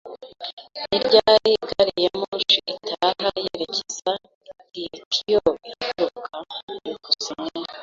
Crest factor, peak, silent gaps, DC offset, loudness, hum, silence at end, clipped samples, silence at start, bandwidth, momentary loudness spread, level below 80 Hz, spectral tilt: 22 dB; -2 dBFS; 0.53-0.57 s, 2.28-2.32 s, 4.35-4.41 s, 5.06-5.11 s, 6.63-6.68 s; under 0.1%; -22 LUFS; none; 0 s; under 0.1%; 0.05 s; 7.6 kHz; 17 LU; -58 dBFS; -2.5 dB/octave